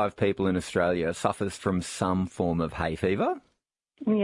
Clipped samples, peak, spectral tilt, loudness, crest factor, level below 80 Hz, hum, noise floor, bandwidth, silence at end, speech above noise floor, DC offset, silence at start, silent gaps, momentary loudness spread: under 0.1%; -8 dBFS; -6 dB/octave; -28 LUFS; 20 dB; -54 dBFS; none; -76 dBFS; 11.5 kHz; 0 s; 49 dB; under 0.1%; 0 s; none; 4 LU